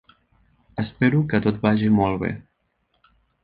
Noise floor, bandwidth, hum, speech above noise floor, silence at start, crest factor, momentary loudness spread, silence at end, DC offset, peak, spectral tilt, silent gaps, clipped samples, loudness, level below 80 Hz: -70 dBFS; 4.9 kHz; none; 50 dB; 0.75 s; 20 dB; 12 LU; 1 s; under 0.1%; -4 dBFS; -10.5 dB/octave; none; under 0.1%; -21 LUFS; -50 dBFS